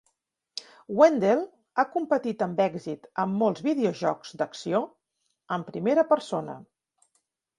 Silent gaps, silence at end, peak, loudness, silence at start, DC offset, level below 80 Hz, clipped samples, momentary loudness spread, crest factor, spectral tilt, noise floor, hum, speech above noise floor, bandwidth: none; 0.95 s; -6 dBFS; -26 LUFS; 0.55 s; under 0.1%; -74 dBFS; under 0.1%; 19 LU; 22 dB; -6 dB/octave; -78 dBFS; none; 52 dB; 11 kHz